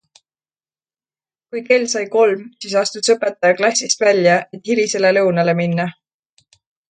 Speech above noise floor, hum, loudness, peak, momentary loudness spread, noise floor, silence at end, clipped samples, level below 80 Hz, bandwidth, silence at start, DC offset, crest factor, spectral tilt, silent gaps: over 74 dB; none; -16 LUFS; 0 dBFS; 7 LU; under -90 dBFS; 1 s; under 0.1%; -68 dBFS; 9.6 kHz; 1.55 s; under 0.1%; 18 dB; -3.5 dB/octave; none